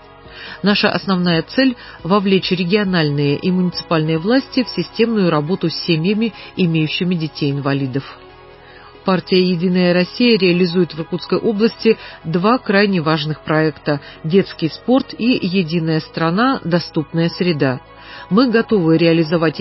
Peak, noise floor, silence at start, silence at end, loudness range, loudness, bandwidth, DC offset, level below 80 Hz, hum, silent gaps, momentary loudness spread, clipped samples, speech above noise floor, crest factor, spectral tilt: -2 dBFS; -40 dBFS; 0.25 s; 0 s; 3 LU; -17 LUFS; 5.8 kHz; under 0.1%; -50 dBFS; none; none; 7 LU; under 0.1%; 24 dB; 16 dB; -10 dB/octave